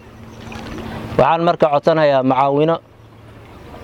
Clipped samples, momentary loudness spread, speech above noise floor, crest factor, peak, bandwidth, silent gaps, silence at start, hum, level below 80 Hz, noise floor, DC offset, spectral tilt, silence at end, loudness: under 0.1%; 17 LU; 27 dB; 14 dB; -2 dBFS; 12 kHz; none; 0.05 s; none; -46 dBFS; -41 dBFS; under 0.1%; -7.5 dB/octave; 0 s; -15 LUFS